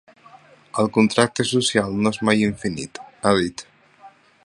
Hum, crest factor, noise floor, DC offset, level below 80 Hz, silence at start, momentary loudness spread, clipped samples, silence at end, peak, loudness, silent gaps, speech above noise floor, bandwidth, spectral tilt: none; 22 dB; -49 dBFS; under 0.1%; -52 dBFS; 0.75 s; 12 LU; under 0.1%; 0.35 s; 0 dBFS; -20 LUFS; none; 29 dB; 11.5 kHz; -4.5 dB/octave